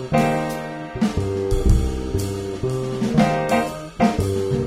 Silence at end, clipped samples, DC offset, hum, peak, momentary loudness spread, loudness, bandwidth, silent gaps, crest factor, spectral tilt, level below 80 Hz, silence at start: 0 s; under 0.1%; under 0.1%; none; -4 dBFS; 8 LU; -22 LUFS; 16 kHz; none; 16 dB; -6.5 dB/octave; -28 dBFS; 0 s